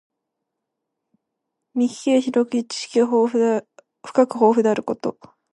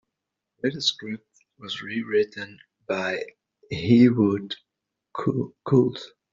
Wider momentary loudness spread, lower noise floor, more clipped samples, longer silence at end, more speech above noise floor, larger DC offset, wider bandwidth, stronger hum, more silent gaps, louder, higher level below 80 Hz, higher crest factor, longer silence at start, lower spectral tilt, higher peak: second, 10 LU vs 20 LU; second, -80 dBFS vs -84 dBFS; neither; first, 0.45 s vs 0.25 s; about the same, 61 dB vs 60 dB; neither; first, 11 kHz vs 7.6 kHz; neither; neither; first, -20 LUFS vs -24 LUFS; second, -74 dBFS vs -64 dBFS; about the same, 20 dB vs 20 dB; first, 1.75 s vs 0.65 s; about the same, -5 dB/octave vs -5 dB/octave; first, -2 dBFS vs -6 dBFS